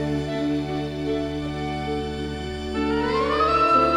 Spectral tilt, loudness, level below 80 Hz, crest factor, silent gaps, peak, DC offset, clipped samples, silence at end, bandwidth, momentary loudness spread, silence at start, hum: -6.5 dB/octave; -24 LUFS; -38 dBFS; 16 dB; none; -8 dBFS; under 0.1%; under 0.1%; 0 s; 11.5 kHz; 10 LU; 0 s; none